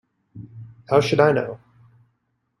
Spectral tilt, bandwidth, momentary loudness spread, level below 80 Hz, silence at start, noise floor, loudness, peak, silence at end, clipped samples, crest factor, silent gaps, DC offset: -6 dB/octave; 11.5 kHz; 24 LU; -60 dBFS; 0.35 s; -72 dBFS; -20 LUFS; -2 dBFS; 1.05 s; under 0.1%; 22 dB; none; under 0.1%